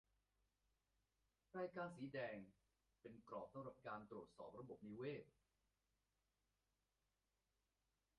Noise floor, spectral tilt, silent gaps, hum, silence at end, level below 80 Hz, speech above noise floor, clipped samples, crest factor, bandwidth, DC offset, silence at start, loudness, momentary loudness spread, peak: under -90 dBFS; -5.5 dB/octave; none; none; 2.9 s; -86 dBFS; over 36 dB; under 0.1%; 20 dB; 5.6 kHz; under 0.1%; 1.55 s; -55 LUFS; 10 LU; -38 dBFS